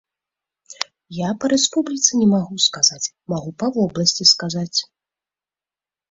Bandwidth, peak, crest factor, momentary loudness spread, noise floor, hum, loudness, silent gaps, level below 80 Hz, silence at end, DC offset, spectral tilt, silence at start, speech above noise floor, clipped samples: 8 kHz; 0 dBFS; 22 dB; 13 LU; under -90 dBFS; none; -18 LUFS; none; -60 dBFS; 1.25 s; under 0.1%; -3 dB/octave; 0.7 s; over 71 dB; under 0.1%